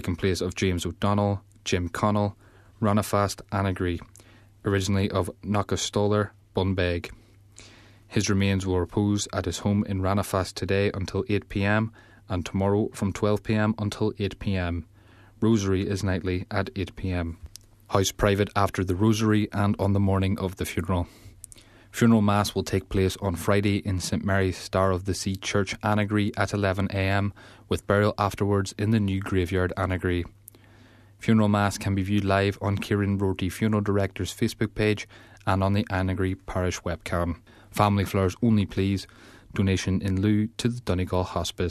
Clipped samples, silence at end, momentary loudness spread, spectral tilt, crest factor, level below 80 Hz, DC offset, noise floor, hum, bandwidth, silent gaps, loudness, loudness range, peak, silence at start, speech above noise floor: under 0.1%; 0 s; 7 LU; -6 dB/octave; 20 dB; -48 dBFS; under 0.1%; -53 dBFS; none; 14 kHz; none; -26 LUFS; 3 LU; -4 dBFS; 0 s; 28 dB